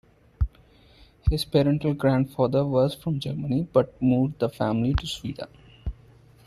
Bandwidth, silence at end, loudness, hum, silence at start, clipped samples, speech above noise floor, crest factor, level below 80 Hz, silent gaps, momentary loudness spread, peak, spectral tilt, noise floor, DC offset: 13.5 kHz; 0.55 s; -25 LUFS; none; 0.4 s; under 0.1%; 31 dB; 18 dB; -36 dBFS; none; 15 LU; -8 dBFS; -7.5 dB/octave; -55 dBFS; under 0.1%